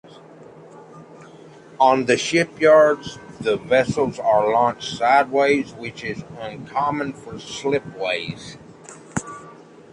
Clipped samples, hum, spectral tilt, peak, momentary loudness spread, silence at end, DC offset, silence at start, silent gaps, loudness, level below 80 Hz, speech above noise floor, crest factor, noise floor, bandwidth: under 0.1%; none; -4.5 dB/octave; -2 dBFS; 20 LU; 0.4 s; under 0.1%; 0.4 s; none; -20 LUFS; -56 dBFS; 24 dB; 18 dB; -44 dBFS; 11 kHz